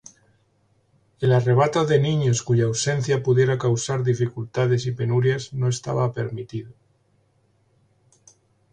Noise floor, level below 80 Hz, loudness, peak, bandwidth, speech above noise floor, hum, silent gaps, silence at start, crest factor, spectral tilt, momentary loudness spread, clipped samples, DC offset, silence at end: -64 dBFS; -58 dBFS; -22 LUFS; -6 dBFS; 9.6 kHz; 43 dB; none; none; 1.2 s; 16 dB; -6 dB/octave; 7 LU; under 0.1%; under 0.1%; 2 s